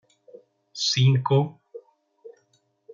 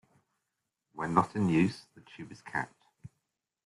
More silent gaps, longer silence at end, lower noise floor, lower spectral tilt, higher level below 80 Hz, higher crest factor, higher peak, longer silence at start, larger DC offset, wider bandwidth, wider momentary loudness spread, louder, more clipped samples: neither; about the same, 0.65 s vs 0.6 s; second, -68 dBFS vs -85 dBFS; second, -5.5 dB/octave vs -7 dB/octave; about the same, -70 dBFS vs -66 dBFS; second, 18 dB vs 24 dB; about the same, -8 dBFS vs -10 dBFS; second, 0.75 s vs 0.95 s; neither; second, 7.6 kHz vs 11.5 kHz; about the same, 21 LU vs 21 LU; first, -22 LUFS vs -31 LUFS; neither